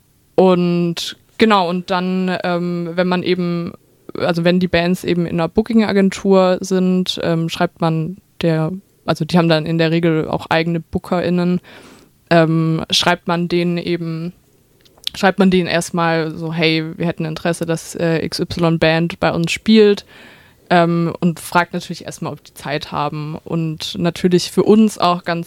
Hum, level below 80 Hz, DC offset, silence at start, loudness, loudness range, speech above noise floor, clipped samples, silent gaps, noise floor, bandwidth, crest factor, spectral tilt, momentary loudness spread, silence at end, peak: none; -48 dBFS; under 0.1%; 0.4 s; -17 LUFS; 3 LU; 36 dB; under 0.1%; none; -52 dBFS; 15 kHz; 16 dB; -6 dB/octave; 10 LU; 0 s; 0 dBFS